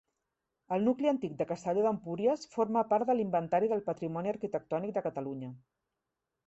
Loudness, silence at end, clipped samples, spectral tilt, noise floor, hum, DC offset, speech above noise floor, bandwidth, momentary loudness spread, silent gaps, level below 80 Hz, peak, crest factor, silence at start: -32 LUFS; 0.9 s; under 0.1%; -7.5 dB/octave; -87 dBFS; none; under 0.1%; 56 dB; 8.2 kHz; 8 LU; none; -74 dBFS; -16 dBFS; 16 dB; 0.7 s